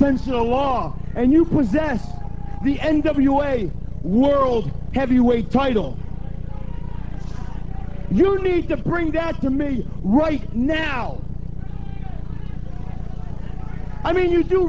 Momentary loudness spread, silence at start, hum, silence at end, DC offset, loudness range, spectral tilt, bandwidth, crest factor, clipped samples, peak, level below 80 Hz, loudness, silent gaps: 15 LU; 0 s; none; 0 s; 4%; 7 LU; -8.5 dB/octave; 7.6 kHz; 16 dB; under 0.1%; -4 dBFS; -32 dBFS; -20 LUFS; none